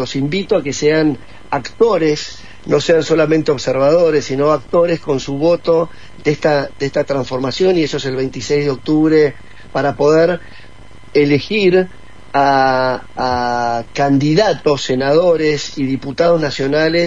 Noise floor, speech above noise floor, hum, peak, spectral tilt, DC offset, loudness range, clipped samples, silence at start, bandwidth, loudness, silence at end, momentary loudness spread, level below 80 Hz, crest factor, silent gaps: -40 dBFS; 25 dB; none; 0 dBFS; -5.5 dB/octave; 2%; 2 LU; under 0.1%; 0 s; 7.8 kHz; -15 LUFS; 0 s; 8 LU; -44 dBFS; 14 dB; none